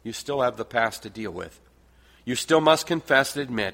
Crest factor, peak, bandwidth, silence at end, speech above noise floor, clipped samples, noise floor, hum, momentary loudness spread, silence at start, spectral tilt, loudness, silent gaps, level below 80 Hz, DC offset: 22 dB; -2 dBFS; 16.5 kHz; 0 s; 32 dB; under 0.1%; -56 dBFS; none; 15 LU; 0.05 s; -3.5 dB/octave; -24 LUFS; none; -58 dBFS; under 0.1%